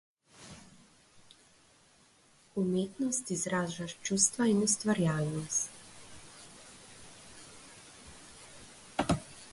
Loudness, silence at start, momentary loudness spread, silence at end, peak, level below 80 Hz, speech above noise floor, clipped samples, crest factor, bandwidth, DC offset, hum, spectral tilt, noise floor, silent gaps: -31 LUFS; 0.4 s; 24 LU; 0 s; -12 dBFS; -60 dBFS; 33 dB; under 0.1%; 24 dB; 11.5 kHz; under 0.1%; none; -4 dB/octave; -64 dBFS; none